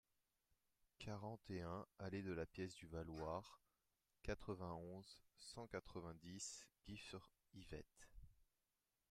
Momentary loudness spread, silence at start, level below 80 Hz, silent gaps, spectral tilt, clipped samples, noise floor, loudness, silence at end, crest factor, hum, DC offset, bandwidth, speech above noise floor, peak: 12 LU; 1 s; -70 dBFS; none; -5 dB/octave; under 0.1%; under -90 dBFS; -54 LUFS; 0.7 s; 22 dB; none; under 0.1%; 15.5 kHz; over 37 dB; -32 dBFS